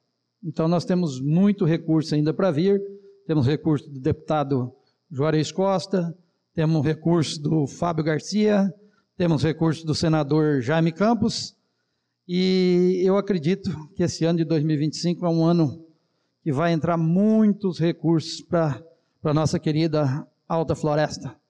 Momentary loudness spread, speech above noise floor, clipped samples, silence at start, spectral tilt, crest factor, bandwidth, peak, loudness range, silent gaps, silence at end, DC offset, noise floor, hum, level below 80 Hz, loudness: 8 LU; 54 dB; under 0.1%; 0.45 s; -7 dB/octave; 10 dB; 9.4 kHz; -12 dBFS; 2 LU; none; 0.15 s; under 0.1%; -75 dBFS; none; -56 dBFS; -23 LUFS